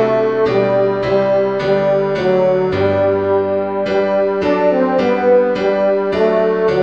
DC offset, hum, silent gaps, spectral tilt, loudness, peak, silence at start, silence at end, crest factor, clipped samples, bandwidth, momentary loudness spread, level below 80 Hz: 0.3%; none; none; -7.5 dB/octave; -15 LUFS; -2 dBFS; 0 s; 0 s; 12 dB; under 0.1%; 7 kHz; 2 LU; -48 dBFS